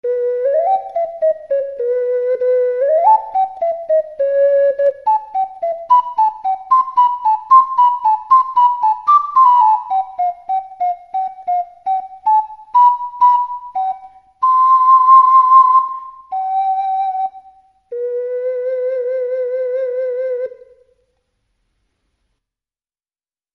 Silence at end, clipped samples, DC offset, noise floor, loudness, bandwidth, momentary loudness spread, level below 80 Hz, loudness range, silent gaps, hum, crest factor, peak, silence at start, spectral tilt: 3.05 s; under 0.1%; under 0.1%; under -90 dBFS; -15 LUFS; 5.6 kHz; 13 LU; -66 dBFS; 10 LU; none; none; 14 dB; 0 dBFS; 0.05 s; -3.5 dB/octave